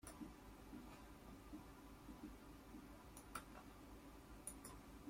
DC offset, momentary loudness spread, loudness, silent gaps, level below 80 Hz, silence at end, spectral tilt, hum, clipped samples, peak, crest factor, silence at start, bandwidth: under 0.1%; 6 LU; -58 LUFS; none; -66 dBFS; 0 s; -4.5 dB/octave; none; under 0.1%; -34 dBFS; 24 dB; 0 s; 16.5 kHz